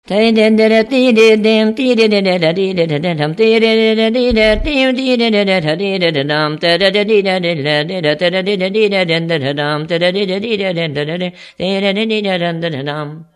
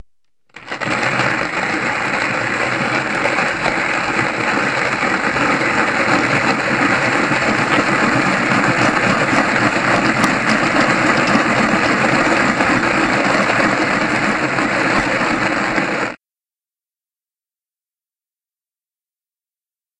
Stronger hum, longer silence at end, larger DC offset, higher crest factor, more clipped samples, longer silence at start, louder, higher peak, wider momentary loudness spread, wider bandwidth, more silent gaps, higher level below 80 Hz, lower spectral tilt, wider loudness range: neither; second, 0.1 s vs 3.85 s; neither; about the same, 12 dB vs 16 dB; neither; second, 0.1 s vs 0.55 s; about the same, -13 LUFS vs -15 LUFS; about the same, 0 dBFS vs 0 dBFS; first, 8 LU vs 4 LU; about the same, 11.5 kHz vs 11.5 kHz; neither; first, -36 dBFS vs -46 dBFS; first, -6 dB/octave vs -4.5 dB/octave; about the same, 5 LU vs 5 LU